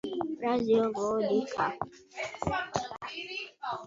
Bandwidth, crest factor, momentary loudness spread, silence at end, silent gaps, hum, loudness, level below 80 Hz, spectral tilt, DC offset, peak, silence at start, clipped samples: 7.8 kHz; 20 dB; 12 LU; 0 s; none; none; -32 LUFS; -58 dBFS; -5 dB/octave; under 0.1%; -12 dBFS; 0.05 s; under 0.1%